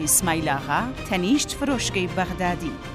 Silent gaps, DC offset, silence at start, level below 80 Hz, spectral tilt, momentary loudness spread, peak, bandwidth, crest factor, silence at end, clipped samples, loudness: none; under 0.1%; 0 s; -40 dBFS; -3.5 dB/octave; 6 LU; -4 dBFS; 16 kHz; 20 dB; 0 s; under 0.1%; -23 LUFS